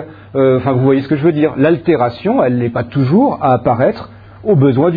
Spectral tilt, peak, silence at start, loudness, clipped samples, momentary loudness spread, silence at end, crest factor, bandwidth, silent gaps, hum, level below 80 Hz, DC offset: -11.5 dB/octave; 0 dBFS; 0 s; -13 LUFS; under 0.1%; 5 LU; 0 s; 12 dB; 5 kHz; none; none; -46 dBFS; under 0.1%